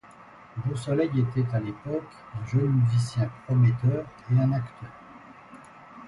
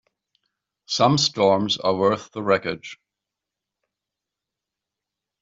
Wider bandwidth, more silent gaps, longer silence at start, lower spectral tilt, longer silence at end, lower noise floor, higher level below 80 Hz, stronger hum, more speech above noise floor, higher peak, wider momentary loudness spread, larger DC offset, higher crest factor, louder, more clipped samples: first, 11.5 kHz vs 7.8 kHz; neither; second, 0.2 s vs 0.9 s; first, -8.5 dB/octave vs -4.5 dB/octave; second, 0 s vs 2.5 s; second, -50 dBFS vs -86 dBFS; first, -56 dBFS vs -64 dBFS; neither; second, 24 dB vs 65 dB; second, -12 dBFS vs -4 dBFS; first, 24 LU vs 12 LU; neither; second, 14 dB vs 20 dB; second, -26 LUFS vs -21 LUFS; neither